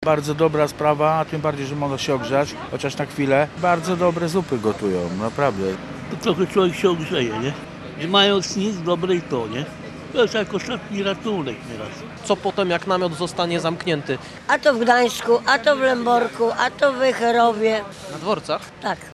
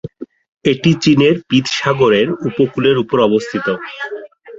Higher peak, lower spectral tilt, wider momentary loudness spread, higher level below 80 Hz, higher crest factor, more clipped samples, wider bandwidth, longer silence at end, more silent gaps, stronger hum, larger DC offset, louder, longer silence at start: about the same, -2 dBFS vs -2 dBFS; about the same, -5 dB/octave vs -6 dB/octave; about the same, 11 LU vs 13 LU; about the same, -54 dBFS vs -52 dBFS; first, 20 dB vs 14 dB; neither; first, 13.5 kHz vs 7.8 kHz; about the same, 0 s vs 0 s; second, none vs 0.49-0.57 s; neither; neither; second, -21 LUFS vs -14 LUFS; about the same, 0 s vs 0.05 s